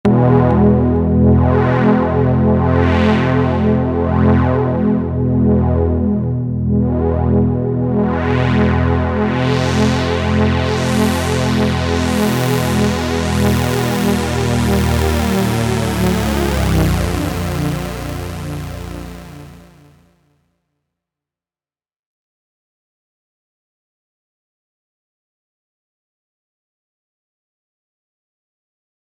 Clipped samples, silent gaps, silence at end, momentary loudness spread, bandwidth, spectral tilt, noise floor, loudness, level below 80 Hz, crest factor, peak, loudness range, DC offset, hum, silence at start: under 0.1%; none; 9.5 s; 7 LU; over 20 kHz; -6.5 dB/octave; under -90 dBFS; -15 LUFS; -30 dBFS; 16 dB; 0 dBFS; 9 LU; under 0.1%; 60 Hz at -45 dBFS; 0.05 s